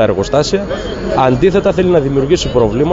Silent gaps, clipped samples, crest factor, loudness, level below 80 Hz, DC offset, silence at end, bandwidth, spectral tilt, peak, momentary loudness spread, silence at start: none; under 0.1%; 12 dB; -13 LUFS; -30 dBFS; under 0.1%; 0 s; 8 kHz; -6 dB/octave; 0 dBFS; 6 LU; 0 s